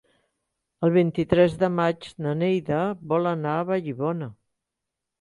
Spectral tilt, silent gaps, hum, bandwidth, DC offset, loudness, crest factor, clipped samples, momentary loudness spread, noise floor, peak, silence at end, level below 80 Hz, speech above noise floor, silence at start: -8.5 dB/octave; none; none; 11 kHz; under 0.1%; -24 LUFS; 20 dB; under 0.1%; 8 LU; -84 dBFS; -4 dBFS; 0.9 s; -56 dBFS; 61 dB; 0.8 s